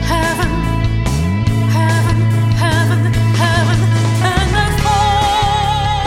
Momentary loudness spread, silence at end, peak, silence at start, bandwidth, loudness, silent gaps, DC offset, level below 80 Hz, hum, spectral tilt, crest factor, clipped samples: 3 LU; 0 s; 0 dBFS; 0 s; 15 kHz; -14 LUFS; none; under 0.1%; -24 dBFS; none; -5.5 dB/octave; 12 dB; under 0.1%